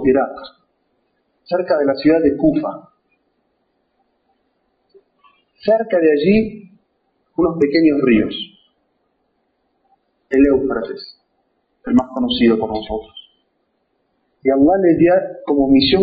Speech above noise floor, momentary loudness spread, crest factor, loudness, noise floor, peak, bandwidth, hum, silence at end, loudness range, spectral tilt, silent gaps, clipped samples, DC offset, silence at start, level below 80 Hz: 52 dB; 15 LU; 14 dB; -16 LUFS; -67 dBFS; -2 dBFS; 5 kHz; none; 0 s; 5 LU; -4.5 dB/octave; none; under 0.1%; under 0.1%; 0 s; -46 dBFS